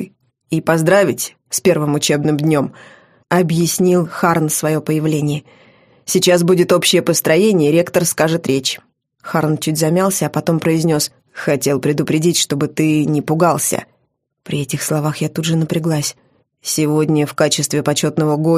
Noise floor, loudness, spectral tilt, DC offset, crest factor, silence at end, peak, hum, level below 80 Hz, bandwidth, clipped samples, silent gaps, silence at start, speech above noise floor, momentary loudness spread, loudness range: -66 dBFS; -16 LUFS; -4.5 dB/octave; under 0.1%; 16 dB; 0 s; 0 dBFS; none; -56 dBFS; 15.5 kHz; under 0.1%; none; 0 s; 51 dB; 9 LU; 4 LU